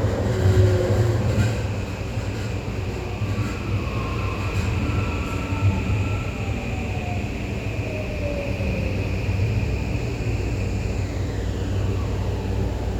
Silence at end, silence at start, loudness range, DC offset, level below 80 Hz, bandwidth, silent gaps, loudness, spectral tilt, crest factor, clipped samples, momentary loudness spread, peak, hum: 0 s; 0 s; 3 LU; under 0.1%; -32 dBFS; 13.5 kHz; none; -25 LUFS; -7 dB/octave; 18 dB; under 0.1%; 7 LU; -6 dBFS; none